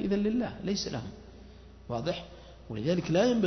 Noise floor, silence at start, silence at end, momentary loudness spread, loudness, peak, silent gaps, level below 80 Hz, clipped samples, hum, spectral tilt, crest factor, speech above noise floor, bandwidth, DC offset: -50 dBFS; 0 s; 0 s; 24 LU; -31 LUFS; -14 dBFS; none; -52 dBFS; under 0.1%; none; -6 dB/octave; 16 dB; 21 dB; 6.4 kHz; under 0.1%